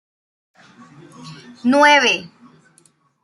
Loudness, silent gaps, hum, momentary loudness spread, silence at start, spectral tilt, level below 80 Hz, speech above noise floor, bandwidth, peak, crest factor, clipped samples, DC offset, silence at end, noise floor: -14 LUFS; none; none; 27 LU; 1.2 s; -2.5 dB/octave; -72 dBFS; 41 dB; 12 kHz; -2 dBFS; 18 dB; under 0.1%; under 0.1%; 0.95 s; -57 dBFS